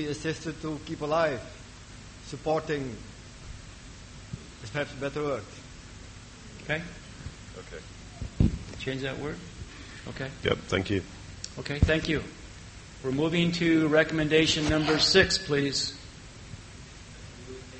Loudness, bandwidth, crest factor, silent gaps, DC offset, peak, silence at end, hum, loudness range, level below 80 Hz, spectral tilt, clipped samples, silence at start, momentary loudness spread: -28 LUFS; 8.4 kHz; 24 dB; none; under 0.1%; -6 dBFS; 0 s; none; 13 LU; -44 dBFS; -4.5 dB/octave; under 0.1%; 0 s; 23 LU